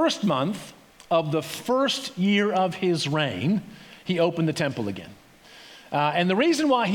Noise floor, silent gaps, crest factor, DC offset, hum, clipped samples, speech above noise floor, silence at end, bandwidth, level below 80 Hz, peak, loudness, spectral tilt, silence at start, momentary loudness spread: -49 dBFS; none; 16 dB; under 0.1%; none; under 0.1%; 26 dB; 0 s; 18.5 kHz; -68 dBFS; -8 dBFS; -24 LUFS; -5.5 dB/octave; 0 s; 15 LU